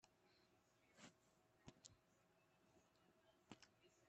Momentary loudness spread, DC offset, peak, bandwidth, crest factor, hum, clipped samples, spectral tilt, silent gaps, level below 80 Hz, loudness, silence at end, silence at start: 2 LU; under 0.1%; -42 dBFS; 8.2 kHz; 32 dB; none; under 0.1%; -3.5 dB/octave; none; under -90 dBFS; -68 LUFS; 0 s; 0 s